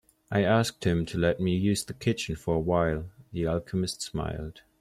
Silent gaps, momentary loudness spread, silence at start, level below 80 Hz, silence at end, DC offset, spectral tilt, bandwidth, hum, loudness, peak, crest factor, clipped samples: none; 10 LU; 0.3 s; -48 dBFS; 0.2 s; under 0.1%; -5.5 dB/octave; 14.5 kHz; none; -28 LUFS; -12 dBFS; 16 dB; under 0.1%